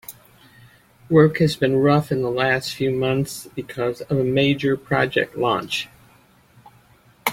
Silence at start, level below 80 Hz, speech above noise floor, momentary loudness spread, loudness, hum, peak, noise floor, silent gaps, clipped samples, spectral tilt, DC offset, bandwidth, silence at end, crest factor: 0.1 s; -54 dBFS; 34 dB; 10 LU; -20 LUFS; none; -2 dBFS; -54 dBFS; none; under 0.1%; -6 dB/octave; under 0.1%; 16.5 kHz; 0 s; 20 dB